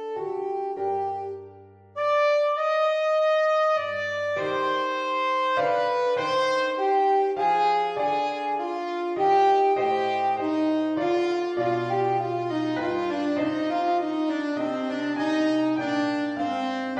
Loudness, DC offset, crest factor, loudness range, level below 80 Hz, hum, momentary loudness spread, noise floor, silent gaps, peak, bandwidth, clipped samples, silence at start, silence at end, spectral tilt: -25 LUFS; under 0.1%; 14 dB; 3 LU; -72 dBFS; none; 7 LU; -48 dBFS; none; -12 dBFS; 9.4 kHz; under 0.1%; 0 s; 0 s; -5.5 dB/octave